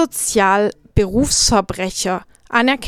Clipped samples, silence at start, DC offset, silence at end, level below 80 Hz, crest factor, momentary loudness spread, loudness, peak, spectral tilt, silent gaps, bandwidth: under 0.1%; 0 s; under 0.1%; 0 s; -32 dBFS; 16 dB; 8 LU; -16 LUFS; 0 dBFS; -3 dB/octave; none; 19 kHz